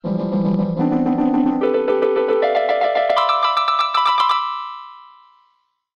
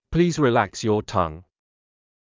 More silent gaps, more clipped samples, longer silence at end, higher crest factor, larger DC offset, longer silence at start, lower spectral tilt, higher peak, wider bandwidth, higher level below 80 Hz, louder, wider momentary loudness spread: neither; neither; about the same, 0.95 s vs 0.95 s; second, 12 dB vs 18 dB; neither; about the same, 0.05 s vs 0.1 s; about the same, -7 dB/octave vs -6 dB/octave; about the same, -6 dBFS vs -6 dBFS; first, 9.6 kHz vs 7.6 kHz; second, -54 dBFS vs -44 dBFS; first, -18 LUFS vs -22 LUFS; about the same, 5 LU vs 6 LU